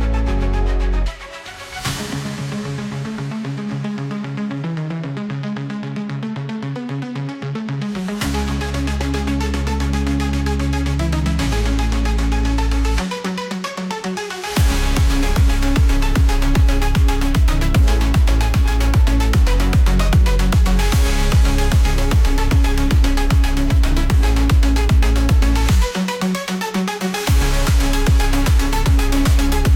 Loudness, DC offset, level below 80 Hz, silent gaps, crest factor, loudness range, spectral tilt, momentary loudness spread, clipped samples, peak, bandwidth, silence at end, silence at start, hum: -19 LUFS; under 0.1%; -18 dBFS; none; 10 dB; 9 LU; -5.5 dB/octave; 9 LU; under 0.1%; -6 dBFS; 16.5 kHz; 0 s; 0 s; none